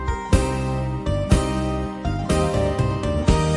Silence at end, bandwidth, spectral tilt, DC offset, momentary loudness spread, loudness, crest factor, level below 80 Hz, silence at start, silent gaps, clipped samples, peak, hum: 0 s; 11.5 kHz; -6.5 dB/octave; under 0.1%; 5 LU; -22 LUFS; 18 dB; -28 dBFS; 0 s; none; under 0.1%; -2 dBFS; none